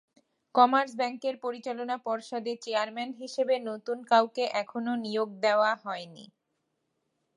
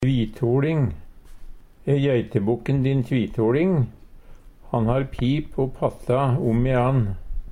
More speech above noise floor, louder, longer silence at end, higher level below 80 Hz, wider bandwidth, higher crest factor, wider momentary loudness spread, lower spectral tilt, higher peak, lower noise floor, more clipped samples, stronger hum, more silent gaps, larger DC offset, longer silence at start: first, 51 dB vs 22 dB; second, -29 LUFS vs -23 LUFS; first, 1.1 s vs 0 s; second, -88 dBFS vs -38 dBFS; about the same, 11.5 kHz vs 10.5 kHz; first, 22 dB vs 16 dB; first, 12 LU vs 7 LU; second, -4 dB/octave vs -9 dB/octave; about the same, -8 dBFS vs -6 dBFS; first, -79 dBFS vs -43 dBFS; neither; neither; neither; neither; first, 0.55 s vs 0 s